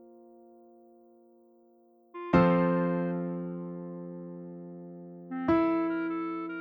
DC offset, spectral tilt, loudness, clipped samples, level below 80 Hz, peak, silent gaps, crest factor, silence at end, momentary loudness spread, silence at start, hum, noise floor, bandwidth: under 0.1%; -10 dB/octave; -29 LUFS; under 0.1%; -58 dBFS; -10 dBFS; none; 22 dB; 0 s; 20 LU; 0 s; none; -62 dBFS; 5.2 kHz